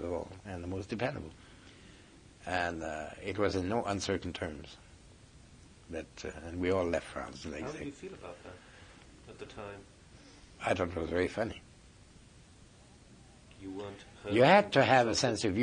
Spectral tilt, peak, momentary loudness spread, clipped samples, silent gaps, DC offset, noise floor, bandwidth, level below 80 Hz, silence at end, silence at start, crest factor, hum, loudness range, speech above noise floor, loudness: -5 dB/octave; -12 dBFS; 25 LU; under 0.1%; none; under 0.1%; -58 dBFS; 10.5 kHz; -60 dBFS; 0 s; 0 s; 24 dB; none; 11 LU; 25 dB; -32 LUFS